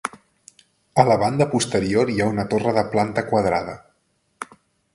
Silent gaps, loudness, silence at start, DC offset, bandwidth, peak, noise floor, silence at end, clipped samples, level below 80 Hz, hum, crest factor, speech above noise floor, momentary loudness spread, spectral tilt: none; -20 LUFS; 0.05 s; under 0.1%; 11.5 kHz; 0 dBFS; -67 dBFS; 0.5 s; under 0.1%; -50 dBFS; none; 22 dB; 47 dB; 20 LU; -5.5 dB/octave